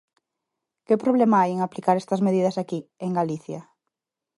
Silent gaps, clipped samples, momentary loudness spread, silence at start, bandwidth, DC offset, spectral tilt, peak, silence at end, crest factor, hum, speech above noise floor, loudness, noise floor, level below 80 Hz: none; under 0.1%; 13 LU; 0.9 s; 11.5 kHz; under 0.1%; -7.5 dB/octave; -6 dBFS; 0.75 s; 18 dB; none; 61 dB; -23 LUFS; -83 dBFS; -74 dBFS